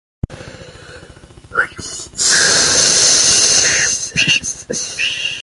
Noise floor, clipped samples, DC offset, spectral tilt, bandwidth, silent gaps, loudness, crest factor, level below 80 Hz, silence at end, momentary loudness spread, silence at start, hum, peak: -39 dBFS; under 0.1%; under 0.1%; 0 dB/octave; 11.5 kHz; none; -11 LUFS; 16 dB; -42 dBFS; 0 s; 17 LU; 0.3 s; none; 0 dBFS